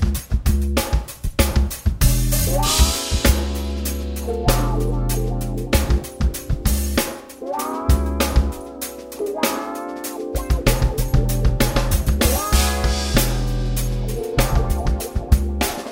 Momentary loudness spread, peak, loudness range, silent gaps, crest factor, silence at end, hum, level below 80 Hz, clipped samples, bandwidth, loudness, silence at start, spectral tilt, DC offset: 8 LU; -2 dBFS; 3 LU; none; 18 dB; 0 s; none; -22 dBFS; under 0.1%; 16.5 kHz; -21 LUFS; 0 s; -4.5 dB/octave; under 0.1%